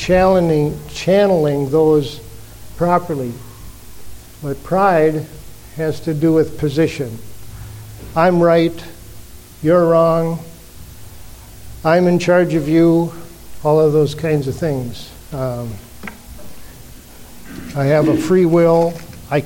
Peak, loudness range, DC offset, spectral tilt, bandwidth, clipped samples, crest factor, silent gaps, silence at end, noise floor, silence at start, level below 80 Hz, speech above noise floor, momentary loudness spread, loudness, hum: 0 dBFS; 5 LU; under 0.1%; -7 dB/octave; 17 kHz; under 0.1%; 16 dB; none; 0 s; -37 dBFS; 0 s; -40 dBFS; 22 dB; 21 LU; -16 LUFS; none